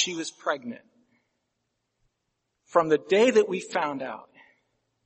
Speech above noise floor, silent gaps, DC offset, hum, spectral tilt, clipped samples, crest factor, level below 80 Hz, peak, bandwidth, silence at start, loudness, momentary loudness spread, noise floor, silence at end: 54 dB; none; under 0.1%; none; -3.5 dB/octave; under 0.1%; 22 dB; -76 dBFS; -6 dBFS; 8.4 kHz; 0 s; -25 LUFS; 19 LU; -79 dBFS; 0.85 s